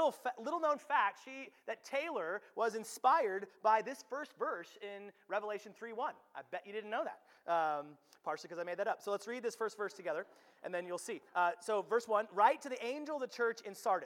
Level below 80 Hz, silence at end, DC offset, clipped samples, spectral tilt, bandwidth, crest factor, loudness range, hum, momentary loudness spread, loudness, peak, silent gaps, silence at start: under -90 dBFS; 0 s; under 0.1%; under 0.1%; -3 dB/octave; 18 kHz; 22 dB; 5 LU; none; 14 LU; -38 LUFS; -16 dBFS; none; 0 s